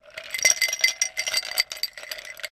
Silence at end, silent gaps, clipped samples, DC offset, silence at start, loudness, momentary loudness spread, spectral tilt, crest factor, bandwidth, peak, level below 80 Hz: 0.05 s; none; under 0.1%; under 0.1%; 0.05 s; -22 LUFS; 14 LU; 3.5 dB/octave; 24 dB; 16 kHz; -2 dBFS; -66 dBFS